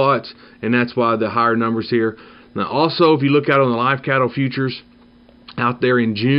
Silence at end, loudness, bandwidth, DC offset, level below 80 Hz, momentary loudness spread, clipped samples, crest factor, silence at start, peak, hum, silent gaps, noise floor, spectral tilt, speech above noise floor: 0 s; -18 LUFS; 5.6 kHz; under 0.1%; -58 dBFS; 11 LU; under 0.1%; 16 dB; 0 s; -2 dBFS; none; none; -48 dBFS; -9.5 dB/octave; 31 dB